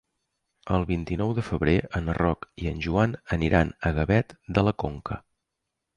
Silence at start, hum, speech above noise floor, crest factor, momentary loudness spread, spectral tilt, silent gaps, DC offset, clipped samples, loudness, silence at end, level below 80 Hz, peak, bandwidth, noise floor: 0.65 s; none; 58 dB; 18 dB; 9 LU; -8 dB/octave; none; under 0.1%; under 0.1%; -26 LUFS; 0.8 s; -38 dBFS; -8 dBFS; 10 kHz; -83 dBFS